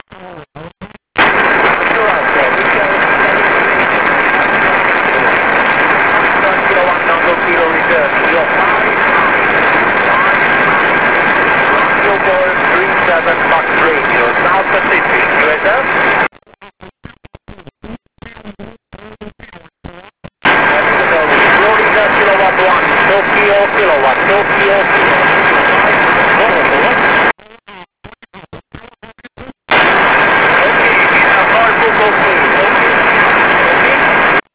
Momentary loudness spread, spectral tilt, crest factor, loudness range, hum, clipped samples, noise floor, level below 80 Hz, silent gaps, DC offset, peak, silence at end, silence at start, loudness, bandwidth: 3 LU; -7.5 dB/octave; 10 dB; 6 LU; none; 0.2%; -40 dBFS; -42 dBFS; none; 1%; 0 dBFS; 0.15 s; 0.1 s; -9 LUFS; 4 kHz